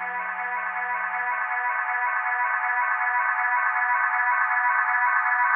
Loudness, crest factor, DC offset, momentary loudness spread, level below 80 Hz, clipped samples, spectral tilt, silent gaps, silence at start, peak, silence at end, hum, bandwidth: -23 LUFS; 16 dB; under 0.1%; 6 LU; under -90 dBFS; under 0.1%; -4.5 dB/octave; none; 0 s; -8 dBFS; 0 s; none; 4 kHz